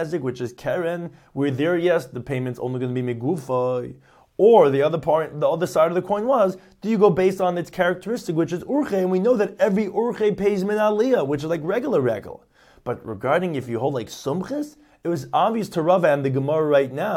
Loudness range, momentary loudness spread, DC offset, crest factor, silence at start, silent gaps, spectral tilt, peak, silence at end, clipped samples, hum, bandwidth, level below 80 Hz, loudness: 5 LU; 11 LU; under 0.1%; 18 dB; 0 s; none; -7 dB/octave; -4 dBFS; 0 s; under 0.1%; none; 16 kHz; -58 dBFS; -22 LUFS